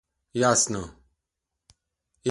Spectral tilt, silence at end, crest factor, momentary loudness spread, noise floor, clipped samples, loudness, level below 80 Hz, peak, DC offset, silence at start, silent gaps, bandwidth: -3 dB/octave; 0 s; 22 dB; 15 LU; -84 dBFS; under 0.1%; -24 LUFS; -56 dBFS; -6 dBFS; under 0.1%; 0.35 s; none; 11.5 kHz